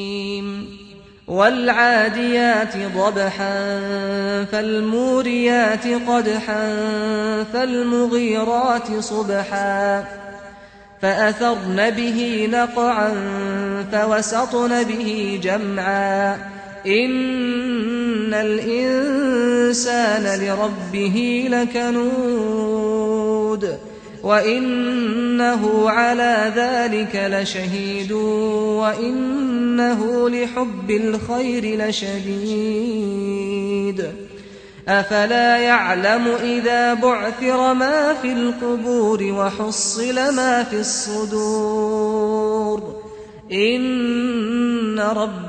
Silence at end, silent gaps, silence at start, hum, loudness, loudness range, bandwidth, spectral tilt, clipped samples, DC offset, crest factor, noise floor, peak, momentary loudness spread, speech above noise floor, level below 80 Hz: 0 s; none; 0 s; none; -19 LUFS; 3 LU; 9.4 kHz; -4 dB/octave; under 0.1%; under 0.1%; 18 dB; -43 dBFS; -2 dBFS; 7 LU; 24 dB; -54 dBFS